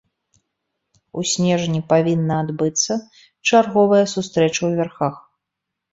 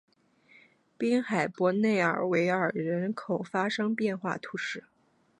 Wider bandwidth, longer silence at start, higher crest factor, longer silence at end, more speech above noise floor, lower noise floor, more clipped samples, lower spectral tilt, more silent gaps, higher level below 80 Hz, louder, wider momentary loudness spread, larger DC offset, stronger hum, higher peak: second, 8 kHz vs 11 kHz; first, 1.15 s vs 1 s; about the same, 18 dB vs 18 dB; first, 0.75 s vs 0.6 s; first, 63 dB vs 33 dB; first, -81 dBFS vs -62 dBFS; neither; second, -4.5 dB/octave vs -6 dB/octave; neither; first, -60 dBFS vs -78 dBFS; first, -19 LUFS vs -29 LUFS; about the same, 10 LU vs 9 LU; neither; neither; first, -2 dBFS vs -12 dBFS